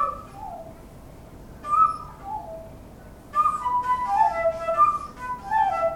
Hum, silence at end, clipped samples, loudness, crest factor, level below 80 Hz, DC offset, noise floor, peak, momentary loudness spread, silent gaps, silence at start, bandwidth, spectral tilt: none; 0 s; under 0.1%; -24 LUFS; 16 dB; -48 dBFS; under 0.1%; -44 dBFS; -8 dBFS; 20 LU; none; 0 s; 17 kHz; -5 dB/octave